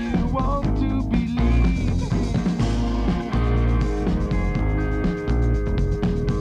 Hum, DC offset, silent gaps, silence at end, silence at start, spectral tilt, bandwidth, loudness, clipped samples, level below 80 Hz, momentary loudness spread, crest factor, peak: none; under 0.1%; none; 0 s; 0 s; -8 dB/octave; 8.2 kHz; -23 LUFS; under 0.1%; -24 dBFS; 3 LU; 12 dB; -8 dBFS